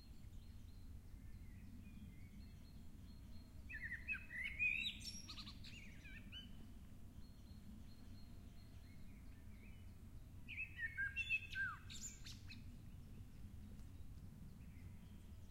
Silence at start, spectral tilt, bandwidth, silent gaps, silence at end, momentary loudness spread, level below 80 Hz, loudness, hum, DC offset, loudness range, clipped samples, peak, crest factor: 0 s; -3 dB/octave; 16 kHz; none; 0 s; 18 LU; -60 dBFS; -49 LUFS; none; under 0.1%; 14 LU; under 0.1%; -32 dBFS; 20 dB